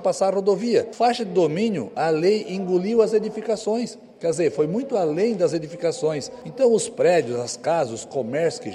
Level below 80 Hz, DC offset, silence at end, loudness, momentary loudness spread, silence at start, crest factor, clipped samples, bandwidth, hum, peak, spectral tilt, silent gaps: -66 dBFS; under 0.1%; 0 s; -22 LUFS; 7 LU; 0 s; 16 dB; under 0.1%; 11.5 kHz; none; -6 dBFS; -5 dB/octave; none